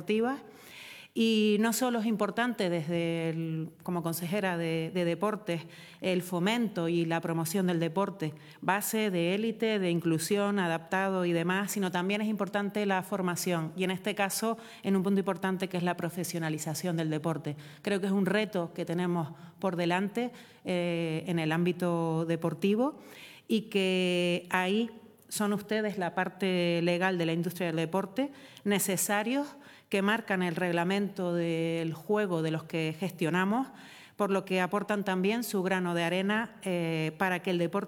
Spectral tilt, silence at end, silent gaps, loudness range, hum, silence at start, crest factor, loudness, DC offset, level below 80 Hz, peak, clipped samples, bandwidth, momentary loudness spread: -5 dB/octave; 0 s; none; 2 LU; none; 0 s; 20 dB; -31 LUFS; under 0.1%; -76 dBFS; -10 dBFS; under 0.1%; 19 kHz; 7 LU